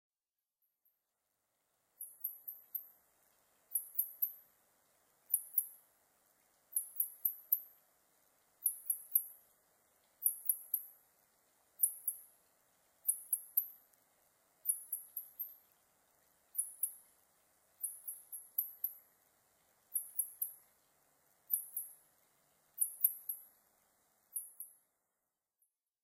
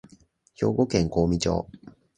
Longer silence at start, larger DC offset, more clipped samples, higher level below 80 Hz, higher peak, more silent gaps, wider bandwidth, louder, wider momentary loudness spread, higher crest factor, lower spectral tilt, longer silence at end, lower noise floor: first, 2 s vs 0.6 s; neither; neither; second, under -90 dBFS vs -42 dBFS; second, -16 dBFS vs -6 dBFS; neither; first, 16 kHz vs 9.6 kHz; second, -38 LUFS vs -25 LUFS; first, 15 LU vs 7 LU; first, 28 dB vs 20 dB; second, 1.5 dB/octave vs -6 dB/octave; first, 1.35 s vs 0.3 s; first, under -90 dBFS vs -58 dBFS